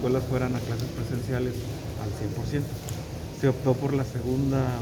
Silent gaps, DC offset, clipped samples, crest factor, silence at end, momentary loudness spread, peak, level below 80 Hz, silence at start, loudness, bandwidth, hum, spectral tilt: none; under 0.1%; under 0.1%; 18 dB; 0 s; 9 LU; -10 dBFS; -44 dBFS; 0 s; -29 LUFS; over 20 kHz; none; -7 dB/octave